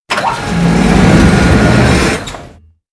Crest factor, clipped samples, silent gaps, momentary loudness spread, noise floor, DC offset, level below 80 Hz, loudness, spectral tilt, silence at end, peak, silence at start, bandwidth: 10 dB; 0.5%; none; 10 LU; -37 dBFS; under 0.1%; -20 dBFS; -9 LUFS; -6 dB/octave; 0.45 s; 0 dBFS; 0.1 s; 11 kHz